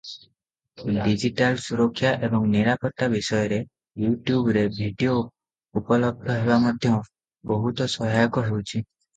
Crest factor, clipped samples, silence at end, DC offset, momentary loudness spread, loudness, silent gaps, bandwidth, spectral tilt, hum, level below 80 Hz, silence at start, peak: 18 dB; under 0.1%; 0.35 s; under 0.1%; 11 LU; -24 LUFS; none; 9.2 kHz; -6.5 dB/octave; none; -52 dBFS; 0.05 s; -4 dBFS